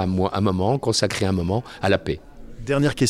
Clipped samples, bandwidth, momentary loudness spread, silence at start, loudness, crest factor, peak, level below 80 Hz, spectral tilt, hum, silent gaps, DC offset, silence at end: under 0.1%; 14.5 kHz; 7 LU; 0 s; -22 LUFS; 18 dB; -4 dBFS; -42 dBFS; -5.5 dB/octave; none; none; under 0.1%; 0 s